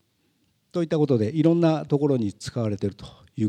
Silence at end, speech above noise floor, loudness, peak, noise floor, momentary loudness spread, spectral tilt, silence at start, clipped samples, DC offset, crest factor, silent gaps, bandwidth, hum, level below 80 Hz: 0 s; 45 dB; -24 LUFS; -8 dBFS; -68 dBFS; 12 LU; -8 dB/octave; 0.75 s; under 0.1%; under 0.1%; 18 dB; none; 10 kHz; none; -60 dBFS